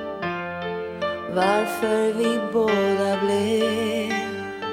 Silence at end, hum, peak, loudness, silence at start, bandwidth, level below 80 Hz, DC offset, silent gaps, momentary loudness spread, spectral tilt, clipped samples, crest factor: 0 s; none; -8 dBFS; -23 LUFS; 0 s; 17 kHz; -60 dBFS; under 0.1%; none; 8 LU; -5 dB/octave; under 0.1%; 16 dB